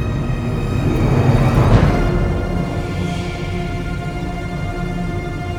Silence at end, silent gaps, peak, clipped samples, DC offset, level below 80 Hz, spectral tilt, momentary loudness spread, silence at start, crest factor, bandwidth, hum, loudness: 0 s; none; -2 dBFS; under 0.1%; 0.1%; -24 dBFS; -7.5 dB/octave; 10 LU; 0 s; 16 dB; 14.5 kHz; none; -19 LUFS